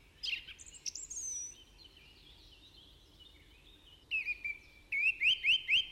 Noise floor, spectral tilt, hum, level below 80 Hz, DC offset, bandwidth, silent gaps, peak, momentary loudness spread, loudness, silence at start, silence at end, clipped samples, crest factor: -60 dBFS; 2.5 dB/octave; none; -64 dBFS; under 0.1%; 16 kHz; none; -20 dBFS; 18 LU; -33 LUFS; 0.2 s; 0 s; under 0.1%; 18 dB